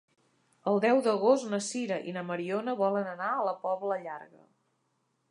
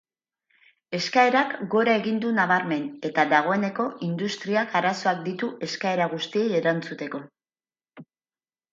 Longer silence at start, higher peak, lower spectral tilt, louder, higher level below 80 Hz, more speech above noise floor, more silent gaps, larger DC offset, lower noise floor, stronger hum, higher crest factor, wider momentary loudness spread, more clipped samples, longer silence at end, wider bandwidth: second, 0.65 s vs 0.9 s; second, -10 dBFS vs -6 dBFS; about the same, -5 dB/octave vs -5 dB/octave; second, -30 LUFS vs -24 LUFS; second, -86 dBFS vs -76 dBFS; second, 47 dB vs over 66 dB; neither; neither; second, -76 dBFS vs under -90 dBFS; neither; about the same, 20 dB vs 20 dB; about the same, 10 LU vs 9 LU; neither; first, 1.05 s vs 0.7 s; first, 11 kHz vs 7.8 kHz